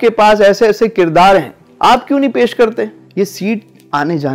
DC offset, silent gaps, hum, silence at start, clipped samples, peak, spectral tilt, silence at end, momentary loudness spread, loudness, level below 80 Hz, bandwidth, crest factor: under 0.1%; none; none; 0 s; under 0.1%; -2 dBFS; -5.5 dB/octave; 0 s; 12 LU; -12 LUFS; -42 dBFS; 16.5 kHz; 8 dB